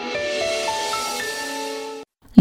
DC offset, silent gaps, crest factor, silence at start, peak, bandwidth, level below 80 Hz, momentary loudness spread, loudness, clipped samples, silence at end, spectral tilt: under 0.1%; none; 22 dB; 0 s; 0 dBFS; 16.5 kHz; -56 dBFS; 9 LU; -24 LUFS; under 0.1%; 0 s; -4 dB/octave